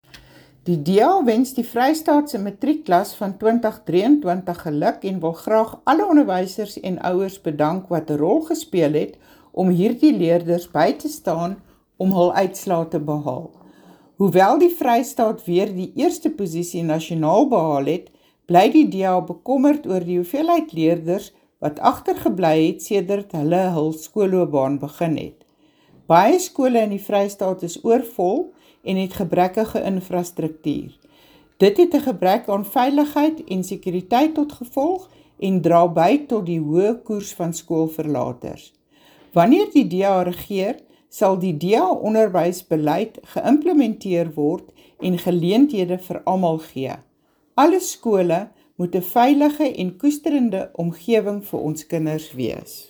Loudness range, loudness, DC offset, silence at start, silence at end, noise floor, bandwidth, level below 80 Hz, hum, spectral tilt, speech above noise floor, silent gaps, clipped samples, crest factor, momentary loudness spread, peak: 3 LU; -20 LUFS; under 0.1%; 0.65 s; 0.05 s; -57 dBFS; over 20 kHz; -58 dBFS; none; -6.5 dB/octave; 38 dB; none; under 0.1%; 20 dB; 11 LU; 0 dBFS